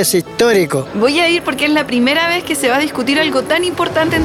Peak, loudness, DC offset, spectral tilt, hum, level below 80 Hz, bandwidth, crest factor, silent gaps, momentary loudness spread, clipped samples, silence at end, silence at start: -2 dBFS; -14 LUFS; under 0.1%; -3.5 dB/octave; none; -48 dBFS; 17 kHz; 12 dB; none; 3 LU; under 0.1%; 0 s; 0 s